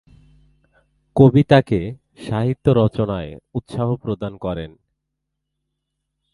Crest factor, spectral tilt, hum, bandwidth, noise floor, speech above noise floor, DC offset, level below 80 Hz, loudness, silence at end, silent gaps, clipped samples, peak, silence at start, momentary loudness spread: 20 dB; -9 dB/octave; none; 11 kHz; -78 dBFS; 60 dB; under 0.1%; -44 dBFS; -19 LUFS; 1.65 s; none; under 0.1%; 0 dBFS; 1.15 s; 17 LU